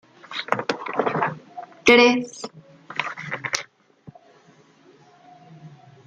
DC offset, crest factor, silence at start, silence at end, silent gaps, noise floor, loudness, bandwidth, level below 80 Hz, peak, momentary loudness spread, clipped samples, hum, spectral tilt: under 0.1%; 24 dB; 0.3 s; 0.4 s; none; -54 dBFS; -21 LUFS; 10.5 kHz; -64 dBFS; -2 dBFS; 24 LU; under 0.1%; none; -3.5 dB/octave